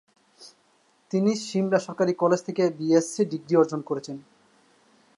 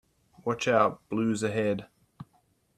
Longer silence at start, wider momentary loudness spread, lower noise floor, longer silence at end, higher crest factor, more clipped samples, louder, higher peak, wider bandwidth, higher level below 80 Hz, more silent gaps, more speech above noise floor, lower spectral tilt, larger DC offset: about the same, 0.4 s vs 0.45 s; about the same, 10 LU vs 10 LU; second, -64 dBFS vs -68 dBFS; first, 0.95 s vs 0.55 s; about the same, 18 dB vs 22 dB; neither; first, -25 LUFS vs -28 LUFS; about the same, -8 dBFS vs -8 dBFS; second, 11.5 kHz vs 13 kHz; second, -78 dBFS vs -66 dBFS; neither; about the same, 40 dB vs 41 dB; about the same, -6 dB/octave vs -5.5 dB/octave; neither